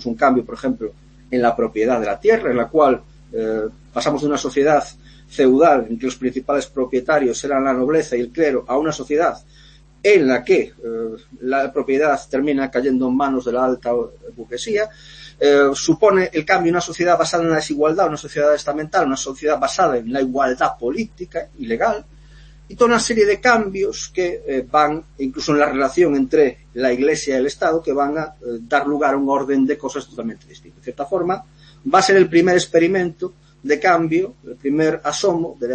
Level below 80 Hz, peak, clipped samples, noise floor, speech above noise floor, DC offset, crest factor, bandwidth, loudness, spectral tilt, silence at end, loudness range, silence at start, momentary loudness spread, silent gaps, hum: -48 dBFS; -2 dBFS; under 0.1%; -43 dBFS; 25 dB; under 0.1%; 16 dB; 8.8 kHz; -18 LUFS; -4.5 dB/octave; 0 s; 3 LU; 0 s; 12 LU; none; none